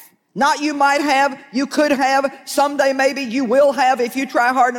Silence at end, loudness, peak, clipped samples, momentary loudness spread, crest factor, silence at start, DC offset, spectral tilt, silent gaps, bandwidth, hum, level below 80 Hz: 0 s; -17 LUFS; -6 dBFS; under 0.1%; 6 LU; 12 dB; 0.35 s; under 0.1%; -3 dB/octave; none; 17.5 kHz; none; -66 dBFS